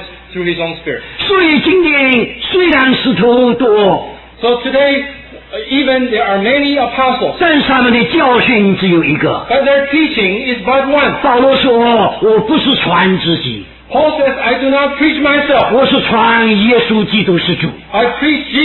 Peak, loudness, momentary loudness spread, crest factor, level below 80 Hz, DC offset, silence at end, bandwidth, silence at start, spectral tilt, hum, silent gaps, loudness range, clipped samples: 0 dBFS; -11 LUFS; 8 LU; 10 dB; -40 dBFS; under 0.1%; 0 s; 4.3 kHz; 0 s; -8.5 dB/octave; none; none; 2 LU; under 0.1%